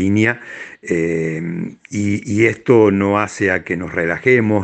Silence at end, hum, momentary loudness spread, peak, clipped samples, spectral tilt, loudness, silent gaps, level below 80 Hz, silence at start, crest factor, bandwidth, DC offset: 0 s; none; 13 LU; 0 dBFS; under 0.1%; -7 dB/octave; -17 LUFS; none; -56 dBFS; 0 s; 16 dB; 9 kHz; under 0.1%